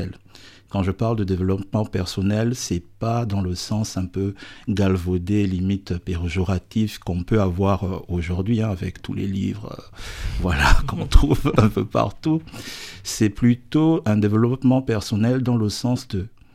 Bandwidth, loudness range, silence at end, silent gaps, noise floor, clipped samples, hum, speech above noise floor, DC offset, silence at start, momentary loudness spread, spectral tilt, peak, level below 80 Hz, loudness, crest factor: 15.5 kHz; 4 LU; 0.25 s; none; -47 dBFS; under 0.1%; none; 26 dB; under 0.1%; 0 s; 10 LU; -6.5 dB/octave; 0 dBFS; -30 dBFS; -22 LUFS; 20 dB